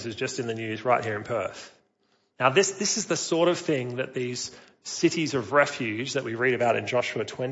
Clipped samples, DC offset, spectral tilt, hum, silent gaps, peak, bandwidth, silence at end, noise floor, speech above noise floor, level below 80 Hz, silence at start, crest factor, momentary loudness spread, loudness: under 0.1%; under 0.1%; -3.5 dB/octave; none; none; -6 dBFS; 8 kHz; 0 s; -70 dBFS; 43 dB; -70 dBFS; 0 s; 22 dB; 8 LU; -26 LUFS